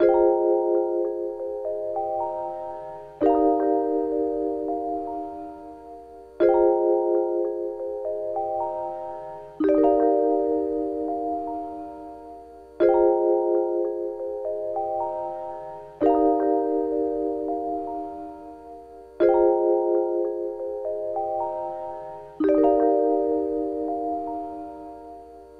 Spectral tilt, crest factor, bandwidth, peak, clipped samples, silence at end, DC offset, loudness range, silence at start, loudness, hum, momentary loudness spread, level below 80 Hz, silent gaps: -8.5 dB/octave; 18 dB; 4.7 kHz; -6 dBFS; under 0.1%; 0 s; under 0.1%; 1 LU; 0 s; -24 LUFS; none; 19 LU; -56 dBFS; none